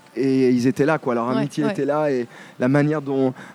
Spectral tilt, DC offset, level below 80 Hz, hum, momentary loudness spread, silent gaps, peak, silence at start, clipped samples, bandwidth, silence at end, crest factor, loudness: -7.5 dB/octave; under 0.1%; -70 dBFS; none; 5 LU; none; -4 dBFS; 0.15 s; under 0.1%; 12 kHz; 0 s; 16 dB; -21 LUFS